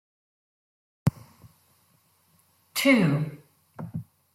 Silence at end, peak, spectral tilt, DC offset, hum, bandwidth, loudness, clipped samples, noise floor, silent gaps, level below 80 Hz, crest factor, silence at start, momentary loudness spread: 0.3 s; -8 dBFS; -5.5 dB/octave; under 0.1%; none; 16.5 kHz; -26 LUFS; under 0.1%; -65 dBFS; none; -62 dBFS; 22 dB; 1.05 s; 19 LU